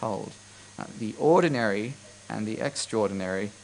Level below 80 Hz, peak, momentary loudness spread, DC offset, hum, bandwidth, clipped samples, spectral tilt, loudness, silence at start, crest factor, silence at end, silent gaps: -68 dBFS; -10 dBFS; 20 LU; under 0.1%; none; 10.5 kHz; under 0.1%; -5 dB/octave; -27 LUFS; 0 s; 18 dB; 0 s; none